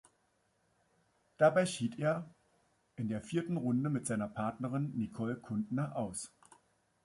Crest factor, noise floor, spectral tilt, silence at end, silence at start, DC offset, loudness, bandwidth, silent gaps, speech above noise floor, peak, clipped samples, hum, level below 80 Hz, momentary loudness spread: 24 dB; -76 dBFS; -6 dB/octave; 0.75 s; 1.4 s; under 0.1%; -35 LUFS; 11.5 kHz; none; 41 dB; -14 dBFS; under 0.1%; none; -70 dBFS; 11 LU